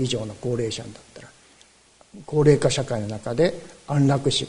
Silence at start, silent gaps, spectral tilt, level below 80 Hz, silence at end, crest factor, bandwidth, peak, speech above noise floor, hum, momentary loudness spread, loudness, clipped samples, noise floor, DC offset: 0 s; none; -5.5 dB/octave; -50 dBFS; 0 s; 20 dB; 11 kHz; -4 dBFS; 33 dB; none; 15 LU; -23 LUFS; under 0.1%; -55 dBFS; under 0.1%